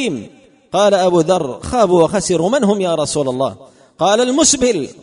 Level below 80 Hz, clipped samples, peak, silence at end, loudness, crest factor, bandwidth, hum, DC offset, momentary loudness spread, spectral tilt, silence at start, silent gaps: -44 dBFS; under 0.1%; -2 dBFS; 0.1 s; -15 LUFS; 14 dB; 11 kHz; none; under 0.1%; 9 LU; -4 dB/octave; 0 s; none